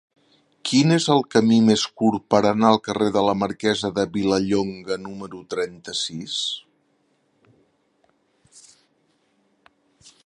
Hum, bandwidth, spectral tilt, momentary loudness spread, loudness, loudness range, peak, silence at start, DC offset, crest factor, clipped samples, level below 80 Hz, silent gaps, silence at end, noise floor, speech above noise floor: none; 11 kHz; -5 dB/octave; 12 LU; -21 LUFS; 13 LU; -2 dBFS; 0.65 s; under 0.1%; 22 dB; under 0.1%; -58 dBFS; none; 3.65 s; -66 dBFS; 46 dB